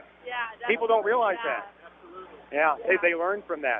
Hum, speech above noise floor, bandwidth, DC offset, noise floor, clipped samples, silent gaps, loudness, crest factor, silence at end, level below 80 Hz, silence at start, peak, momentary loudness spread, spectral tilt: none; 20 dB; 4.6 kHz; under 0.1%; -46 dBFS; under 0.1%; none; -26 LUFS; 18 dB; 0 s; -68 dBFS; 0.25 s; -10 dBFS; 22 LU; -7 dB/octave